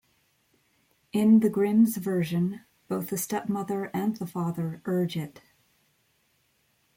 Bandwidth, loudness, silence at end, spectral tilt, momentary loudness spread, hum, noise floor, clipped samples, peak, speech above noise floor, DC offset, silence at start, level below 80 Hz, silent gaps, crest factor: 17 kHz; -27 LUFS; 1.65 s; -6.5 dB/octave; 12 LU; none; -70 dBFS; under 0.1%; -12 dBFS; 44 dB; under 0.1%; 1.15 s; -70 dBFS; none; 16 dB